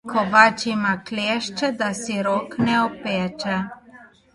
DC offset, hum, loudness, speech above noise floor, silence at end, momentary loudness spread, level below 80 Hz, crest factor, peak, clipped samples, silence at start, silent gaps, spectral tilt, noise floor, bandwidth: under 0.1%; none; -21 LUFS; 27 dB; 0.3 s; 10 LU; -58 dBFS; 22 dB; 0 dBFS; under 0.1%; 0.05 s; none; -4.5 dB/octave; -48 dBFS; 11.5 kHz